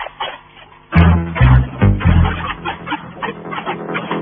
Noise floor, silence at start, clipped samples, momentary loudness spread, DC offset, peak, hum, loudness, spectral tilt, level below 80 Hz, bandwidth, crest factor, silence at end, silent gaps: -42 dBFS; 0 s; 0.1%; 14 LU; under 0.1%; 0 dBFS; none; -16 LUFS; -10.5 dB/octave; -22 dBFS; 4.7 kHz; 16 dB; 0 s; none